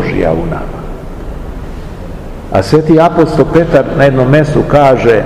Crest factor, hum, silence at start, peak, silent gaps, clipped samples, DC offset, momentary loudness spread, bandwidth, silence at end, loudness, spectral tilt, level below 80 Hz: 10 dB; none; 0 s; 0 dBFS; none; 3%; under 0.1%; 19 LU; 13.5 kHz; 0 s; -9 LUFS; -7.5 dB/octave; -24 dBFS